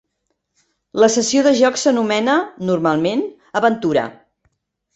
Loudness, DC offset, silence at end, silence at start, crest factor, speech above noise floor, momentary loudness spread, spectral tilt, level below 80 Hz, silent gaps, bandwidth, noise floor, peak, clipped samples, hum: -17 LUFS; under 0.1%; 0.85 s; 0.95 s; 16 dB; 56 dB; 9 LU; -4 dB/octave; -60 dBFS; none; 8.4 kHz; -72 dBFS; -2 dBFS; under 0.1%; none